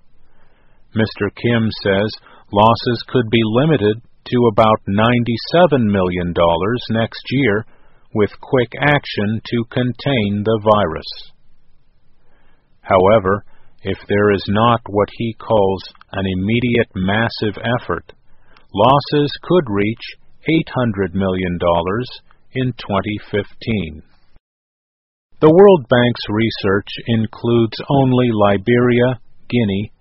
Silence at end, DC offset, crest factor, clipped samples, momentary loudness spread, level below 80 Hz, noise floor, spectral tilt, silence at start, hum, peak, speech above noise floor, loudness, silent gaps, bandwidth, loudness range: 0.15 s; under 0.1%; 16 dB; under 0.1%; 10 LU; -44 dBFS; -46 dBFS; -5 dB/octave; 0.2 s; none; 0 dBFS; 30 dB; -16 LUFS; 24.40-25.29 s; 5.8 kHz; 5 LU